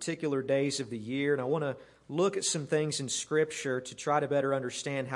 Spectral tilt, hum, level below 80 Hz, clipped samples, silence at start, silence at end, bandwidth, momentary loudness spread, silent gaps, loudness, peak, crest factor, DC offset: -4 dB/octave; none; -74 dBFS; under 0.1%; 0 s; 0 s; 11.5 kHz; 6 LU; none; -31 LUFS; -14 dBFS; 18 dB; under 0.1%